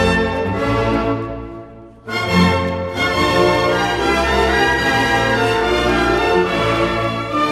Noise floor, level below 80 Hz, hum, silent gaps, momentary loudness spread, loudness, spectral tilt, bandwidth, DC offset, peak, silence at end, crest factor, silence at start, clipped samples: -37 dBFS; -32 dBFS; none; none; 8 LU; -16 LUFS; -5 dB/octave; 15 kHz; under 0.1%; -2 dBFS; 0 s; 14 dB; 0 s; under 0.1%